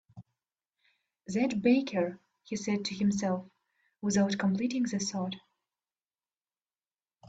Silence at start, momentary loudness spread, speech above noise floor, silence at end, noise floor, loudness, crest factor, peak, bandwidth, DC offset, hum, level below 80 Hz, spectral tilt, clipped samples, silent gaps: 0.15 s; 10 LU; over 60 dB; 0 s; under -90 dBFS; -31 LUFS; 20 dB; -14 dBFS; 8 kHz; under 0.1%; none; -70 dBFS; -5 dB/octave; under 0.1%; none